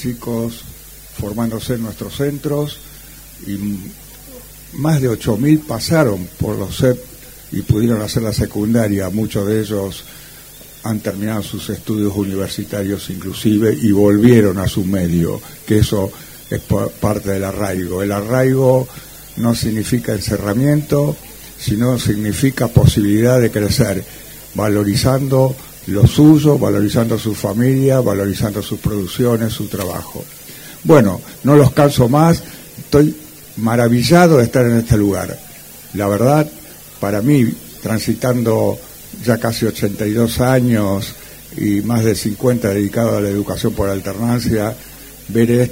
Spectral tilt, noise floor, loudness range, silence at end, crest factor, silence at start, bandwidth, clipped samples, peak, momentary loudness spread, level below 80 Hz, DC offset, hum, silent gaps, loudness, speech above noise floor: -6.5 dB/octave; -38 dBFS; 7 LU; 0 s; 16 dB; 0 s; 16.5 kHz; under 0.1%; 0 dBFS; 19 LU; -36 dBFS; under 0.1%; none; none; -16 LUFS; 23 dB